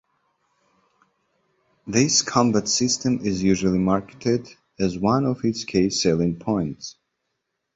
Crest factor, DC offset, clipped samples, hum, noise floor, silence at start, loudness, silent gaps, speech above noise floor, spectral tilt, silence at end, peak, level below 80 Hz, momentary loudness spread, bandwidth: 20 dB; under 0.1%; under 0.1%; none; -78 dBFS; 1.85 s; -22 LUFS; none; 56 dB; -4.5 dB/octave; 0.85 s; -4 dBFS; -50 dBFS; 8 LU; 8 kHz